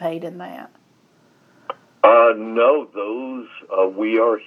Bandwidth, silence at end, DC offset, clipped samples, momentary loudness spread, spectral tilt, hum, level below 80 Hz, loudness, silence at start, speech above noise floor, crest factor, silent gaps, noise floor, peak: 4 kHz; 0.05 s; under 0.1%; under 0.1%; 22 LU; -7 dB/octave; none; -86 dBFS; -17 LUFS; 0 s; 39 dB; 20 dB; none; -57 dBFS; 0 dBFS